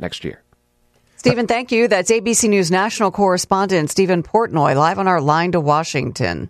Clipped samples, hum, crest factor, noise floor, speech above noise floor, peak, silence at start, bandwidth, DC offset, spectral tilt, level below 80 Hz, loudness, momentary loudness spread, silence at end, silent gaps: under 0.1%; none; 14 dB; -60 dBFS; 44 dB; -2 dBFS; 0 s; 14 kHz; under 0.1%; -4.5 dB/octave; -50 dBFS; -16 LUFS; 5 LU; 0 s; none